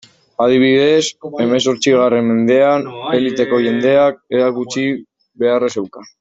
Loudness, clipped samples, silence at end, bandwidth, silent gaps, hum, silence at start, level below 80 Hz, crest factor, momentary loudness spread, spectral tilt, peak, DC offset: -14 LUFS; under 0.1%; 0.15 s; 8 kHz; none; none; 0.4 s; -58 dBFS; 12 dB; 9 LU; -5 dB/octave; -2 dBFS; under 0.1%